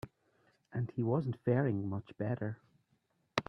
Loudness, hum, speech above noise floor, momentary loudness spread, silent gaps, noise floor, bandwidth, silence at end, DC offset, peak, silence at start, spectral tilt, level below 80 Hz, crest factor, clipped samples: -36 LUFS; none; 42 dB; 11 LU; none; -77 dBFS; 8.4 kHz; 0.05 s; under 0.1%; -12 dBFS; 0.05 s; -8 dB/octave; -72 dBFS; 24 dB; under 0.1%